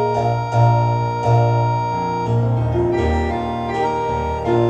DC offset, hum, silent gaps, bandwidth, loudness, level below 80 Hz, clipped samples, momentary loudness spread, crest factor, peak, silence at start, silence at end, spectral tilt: under 0.1%; none; none; 7.6 kHz; -18 LUFS; -32 dBFS; under 0.1%; 6 LU; 14 dB; -4 dBFS; 0 s; 0 s; -8 dB/octave